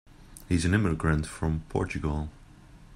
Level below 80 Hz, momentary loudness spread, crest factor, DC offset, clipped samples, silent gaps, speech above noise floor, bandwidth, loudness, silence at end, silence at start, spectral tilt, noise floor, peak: -42 dBFS; 7 LU; 18 dB; under 0.1%; under 0.1%; none; 24 dB; 14 kHz; -29 LUFS; 0 s; 0.1 s; -6.5 dB/octave; -51 dBFS; -10 dBFS